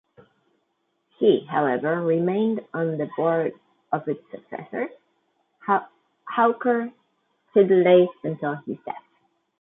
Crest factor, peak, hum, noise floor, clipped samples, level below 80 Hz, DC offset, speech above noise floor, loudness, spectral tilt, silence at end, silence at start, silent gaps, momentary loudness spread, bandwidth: 20 dB; -4 dBFS; none; -73 dBFS; under 0.1%; -74 dBFS; under 0.1%; 51 dB; -23 LUFS; -11 dB/octave; 0.6 s; 1.2 s; none; 16 LU; 3.9 kHz